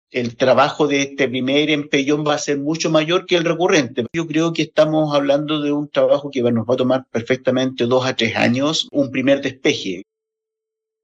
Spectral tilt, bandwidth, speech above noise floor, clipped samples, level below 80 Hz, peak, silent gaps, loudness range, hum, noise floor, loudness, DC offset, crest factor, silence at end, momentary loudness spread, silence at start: -5 dB/octave; 8.2 kHz; 66 dB; under 0.1%; -62 dBFS; -2 dBFS; none; 1 LU; none; -83 dBFS; -18 LUFS; under 0.1%; 16 dB; 1 s; 4 LU; 0.15 s